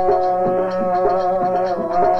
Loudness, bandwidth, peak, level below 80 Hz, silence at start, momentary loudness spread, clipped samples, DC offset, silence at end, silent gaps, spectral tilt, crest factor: -18 LUFS; 6.4 kHz; -6 dBFS; -44 dBFS; 0 s; 2 LU; under 0.1%; under 0.1%; 0 s; none; -8 dB/octave; 12 dB